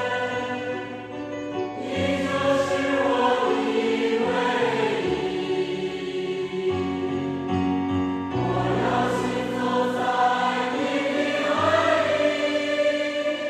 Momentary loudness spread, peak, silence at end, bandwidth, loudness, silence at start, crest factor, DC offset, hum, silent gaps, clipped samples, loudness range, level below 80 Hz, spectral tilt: 8 LU; -8 dBFS; 0 s; 13 kHz; -24 LUFS; 0 s; 16 dB; under 0.1%; none; none; under 0.1%; 4 LU; -56 dBFS; -5.5 dB/octave